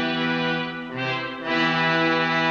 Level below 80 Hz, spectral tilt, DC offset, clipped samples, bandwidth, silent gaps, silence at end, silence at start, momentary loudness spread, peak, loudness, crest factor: -62 dBFS; -5.5 dB/octave; under 0.1%; under 0.1%; 7.4 kHz; none; 0 s; 0 s; 8 LU; -10 dBFS; -23 LUFS; 14 dB